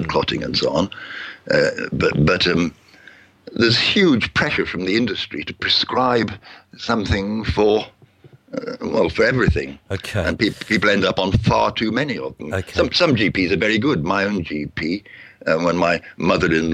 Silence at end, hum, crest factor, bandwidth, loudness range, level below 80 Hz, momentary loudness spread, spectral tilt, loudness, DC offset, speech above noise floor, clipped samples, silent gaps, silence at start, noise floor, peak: 0 s; none; 16 dB; 13.5 kHz; 3 LU; -38 dBFS; 11 LU; -5.5 dB/octave; -19 LUFS; under 0.1%; 30 dB; under 0.1%; none; 0 s; -49 dBFS; -4 dBFS